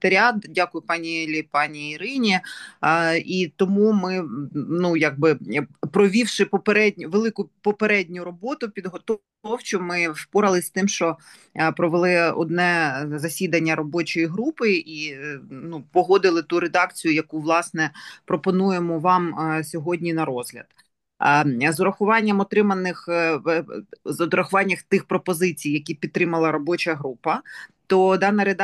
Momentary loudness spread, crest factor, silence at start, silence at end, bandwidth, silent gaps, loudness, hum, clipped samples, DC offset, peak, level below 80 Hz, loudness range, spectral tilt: 11 LU; 18 dB; 0 s; 0 s; 12.5 kHz; none; -22 LUFS; none; under 0.1%; under 0.1%; -4 dBFS; -70 dBFS; 3 LU; -5 dB/octave